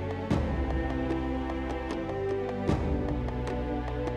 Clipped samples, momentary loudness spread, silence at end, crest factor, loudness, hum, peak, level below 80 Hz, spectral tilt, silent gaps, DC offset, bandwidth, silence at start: under 0.1%; 4 LU; 0 s; 16 dB; -31 LUFS; none; -14 dBFS; -36 dBFS; -8 dB/octave; none; under 0.1%; 9.6 kHz; 0 s